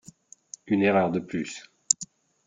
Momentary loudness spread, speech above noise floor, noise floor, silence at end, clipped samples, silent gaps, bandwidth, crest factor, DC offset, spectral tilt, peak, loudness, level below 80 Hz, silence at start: 20 LU; 28 dB; -53 dBFS; 0.4 s; under 0.1%; none; 10 kHz; 26 dB; under 0.1%; -4 dB/octave; -2 dBFS; -26 LUFS; -68 dBFS; 0.65 s